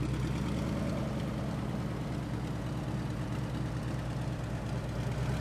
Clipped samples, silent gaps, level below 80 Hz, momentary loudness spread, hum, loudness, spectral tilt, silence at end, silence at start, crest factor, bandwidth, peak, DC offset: under 0.1%; none; -44 dBFS; 3 LU; none; -36 LUFS; -7 dB/octave; 0 s; 0 s; 12 dB; 14 kHz; -22 dBFS; under 0.1%